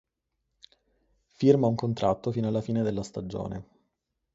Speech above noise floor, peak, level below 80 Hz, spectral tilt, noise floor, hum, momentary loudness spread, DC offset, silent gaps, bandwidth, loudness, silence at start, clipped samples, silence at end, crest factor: 54 dB; -6 dBFS; -56 dBFS; -8 dB/octave; -81 dBFS; none; 13 LU; under 0.1%; none; 7.8 kHz; -27 LUFS; 1.4 s; under 0.1%; 0.7 s; 22 dB